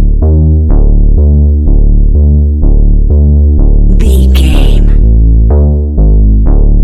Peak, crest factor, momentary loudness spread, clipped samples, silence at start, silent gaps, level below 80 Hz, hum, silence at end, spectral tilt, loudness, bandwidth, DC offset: 0 dBFS; 4 dB; 2 LU; 0.6%; 0 s; none; -4 dBFS; none; 0 s; -8.5 dB/octave; -8 LUFS; 12 kHz; under 0.1%